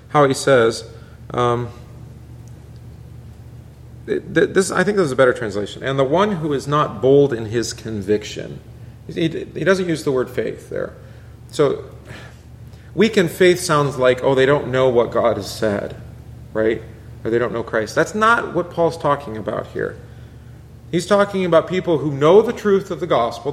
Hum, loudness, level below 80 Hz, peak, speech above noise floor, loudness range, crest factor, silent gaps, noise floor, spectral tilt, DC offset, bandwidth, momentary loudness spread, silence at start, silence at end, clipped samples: none; -18 LUFS; -46 dBFS; -2 dBFS; 22 dB; 6 LU; 18 dB; none; -39 dBFS; -5.5 dB/octave; under 0.1%; 15 kHz; 23 LU; 0.1 s; 0 s; under 0.1%